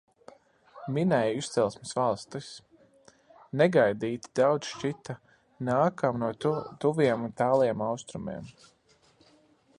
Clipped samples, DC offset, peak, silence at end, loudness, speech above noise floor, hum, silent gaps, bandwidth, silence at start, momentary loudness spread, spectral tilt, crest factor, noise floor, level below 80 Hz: under 0.1%; under 0.1%; -8 dBFS; 1.3 s; -28 LUFS; 35 dB; none; none; 11 kHz; 0.75 s; 16 LU; -6 dB/octave; 20 dB; -63 dBFS; -66 dBFS